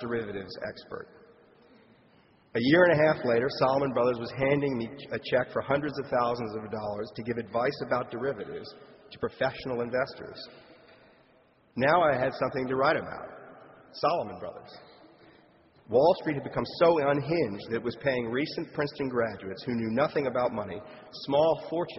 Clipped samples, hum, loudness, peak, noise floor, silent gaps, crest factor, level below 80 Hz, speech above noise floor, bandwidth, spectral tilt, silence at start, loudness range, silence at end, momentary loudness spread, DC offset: under 0.1%; none; -28 LUFS; -10 dBFS; -63 dBFS; none; 20 dB; -62 dBFS; 34 dB; 6 kHz; -4.5 dB/octave; 0 s; 7 LU; 0 s; 18 LU; under 0.1%